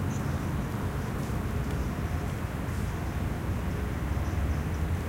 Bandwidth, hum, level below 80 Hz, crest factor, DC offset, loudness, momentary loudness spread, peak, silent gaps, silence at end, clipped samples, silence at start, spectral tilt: 16 kHz; none; -36 dBFS; 12 dB; under 0.1%; -32 LUFS; 2 LU; -18 dBFS; none; 0 s; under 0.1%; 0 s; -7 dB/octave